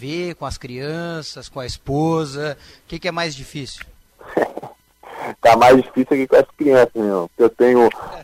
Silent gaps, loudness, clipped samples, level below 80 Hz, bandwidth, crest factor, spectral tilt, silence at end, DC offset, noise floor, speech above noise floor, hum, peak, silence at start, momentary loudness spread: none; -17 LUFS; under 0.1%; -46 dBFS; 16 kHz; 14 dB; -5.5 dB/octave; 0 s; under 0.1%; -41 dBFS; 23 dB; none; -4 dBFS; 0 s; 18 LU